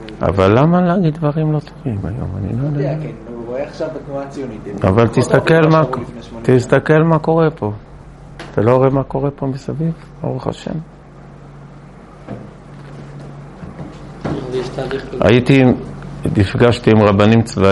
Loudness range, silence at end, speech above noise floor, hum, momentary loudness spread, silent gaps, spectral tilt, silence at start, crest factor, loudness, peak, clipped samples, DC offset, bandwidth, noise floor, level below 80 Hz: 15 LU; 0 s; 23 dB; none; 21 LU; none; -7.5 dB/octave; 0 s; 16 dB; -15 LUFS; 0 dBFS; under 0.1%; under 0.1%; 11.5 kHz; -38 dBFS; -40 dBFS